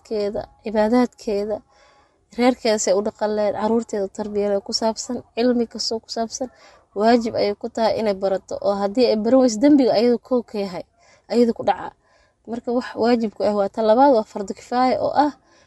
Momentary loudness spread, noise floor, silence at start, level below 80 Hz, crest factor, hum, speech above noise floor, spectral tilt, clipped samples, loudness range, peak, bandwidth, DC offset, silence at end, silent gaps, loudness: 13 LU; -56 dBFS; 0.1 s; -56 dBFS; 18 dB; none; 36 dB; -4.5 dB/octave; under 0.1%; 4 LU; -2 dBFS; 12 kHz; under 0.1%; 0.35 s; none; -20 LUFS